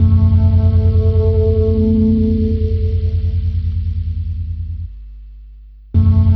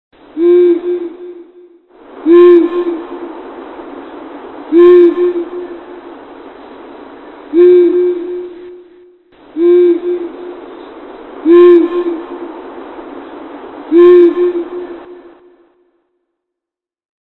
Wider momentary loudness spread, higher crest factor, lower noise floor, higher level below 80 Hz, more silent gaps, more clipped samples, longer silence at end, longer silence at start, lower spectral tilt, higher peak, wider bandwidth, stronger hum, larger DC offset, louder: second, 12 LU vs 26 LU; about the same, 12 dB vs 12 dB; second, -37 dBFS vs -84 dBFS; first, -20 dBFS vs -56 dBFS; neither; neither; second, 0 s vs 2.05 s; second, 0 s vs 0.35 s; first, -12.5 dB/octave vs -8 dB/octave; about the same, -2 dBFS vs 0 dBFS; first, 4.6 kHz vs 4.1 kHz; first, 50 Hz at -25 dBFS vs none; neither; second, -15 LUFS vs -9 LUFS